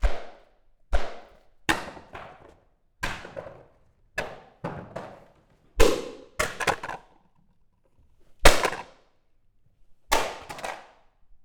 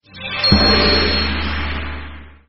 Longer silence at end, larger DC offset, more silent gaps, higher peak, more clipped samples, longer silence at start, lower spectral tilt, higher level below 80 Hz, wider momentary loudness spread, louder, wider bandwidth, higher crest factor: first, 0.65 s vs 0 s; neither; neither; about the same, -2 dBFS vs 0 dBFS; neither; about the same, 0 s vs 0 s; about the same, -3 dB/octave vs -2.5 dB/octave; second, -34 dBFS vs -26 dBFS; first, 21 LU vs 18 LU; second, -28 LUFS vs -15 LUFS; first, 19.5 kHz vs 6 kHz; first, 26 dB vs 18 dB